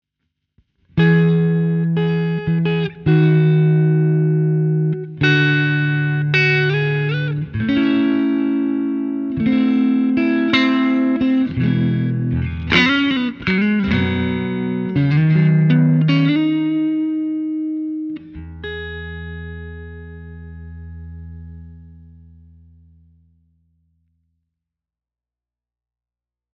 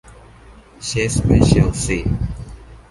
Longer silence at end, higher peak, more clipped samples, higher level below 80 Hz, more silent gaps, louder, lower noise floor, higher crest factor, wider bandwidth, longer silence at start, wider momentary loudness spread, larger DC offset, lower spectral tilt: first, 4.55 s vs 0.15 s; about the same, 0 dBFS vs 0 dBFS; neither; second, -46 dBFS vs -28 dBFS; neither; about the same, -17 LUFS vs -17 LUFS; first, -89 dBFS vs -43 dBFS; about the same, 18 dB vs 18 dB; second, 6.6 kHz vs 11.5 kHz; first, 0.95 s vs 0.05 s; about the same, 18 LU vs 17 LU; neither; first, -8.5 dB/octave vs -5.5 dB/octave